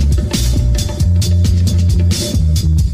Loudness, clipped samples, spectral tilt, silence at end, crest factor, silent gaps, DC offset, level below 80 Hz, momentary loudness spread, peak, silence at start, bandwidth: -14 LUFS; under 0.1%; -5.5 dB/octave; 0 s; 8 dB; none; under 0.1%; -16 dBFS; 3 LU; -4 dBFS; 0 s; 16 kHz